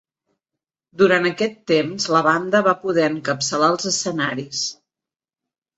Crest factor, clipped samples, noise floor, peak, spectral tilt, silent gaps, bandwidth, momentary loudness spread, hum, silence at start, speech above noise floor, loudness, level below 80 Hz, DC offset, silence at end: 18 dB; under 0.1%; -90 dBFS; -2 dBFS; -3.5 dB/octave; none; 8.2 kHz; 8 LU; none; 0.95 s; 70 dB; -19 LUFS; -64 dBFS; under 0.1%; 1.05 s